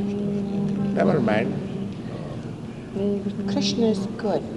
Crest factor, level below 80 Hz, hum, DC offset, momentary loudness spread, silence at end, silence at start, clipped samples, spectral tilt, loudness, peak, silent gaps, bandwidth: 18 dB; -50 dBFS; none; under 0.1%; 12 LU; 0 s; 0 s; under 0.1%; -6.5 dB/octave; -25 LUFS; -6 dBFS; none; 11 kHz